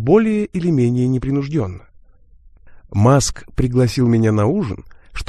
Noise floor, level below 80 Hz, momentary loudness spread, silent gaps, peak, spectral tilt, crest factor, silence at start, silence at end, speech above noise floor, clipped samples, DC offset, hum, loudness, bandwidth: -46 dBFS; -36 dBFS; 12 LU; none; 0 dBFS; -6.5 dB/octave; 16 dB; 0 s; 0.05 s; 30 dB; under 0.1%; under 0.1%; none; -17 LUFS; 13 kHz